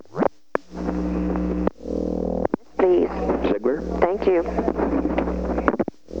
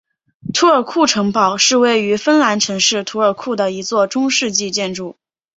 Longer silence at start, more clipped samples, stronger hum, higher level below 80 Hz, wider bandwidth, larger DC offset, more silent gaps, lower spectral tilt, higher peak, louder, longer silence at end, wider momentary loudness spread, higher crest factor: second, 0.1 s vs 0.45 s; neither; neither; first, -36 dBFS vs -60 dBFS; about the same, 7.4 kHz vs 8 kHz; first, 0.6% vs under 0.1%; neither; first, -8.5 dB/octave vs -2.5 dB/octave; about the same, 0 dBFS vs 0 dBFS; second, -23 LUFS vs -15 LUFS; second, 0 s vs 0.45 s; about the same, 8 LU vs 8 LU; first, 22 dB vs 16 dB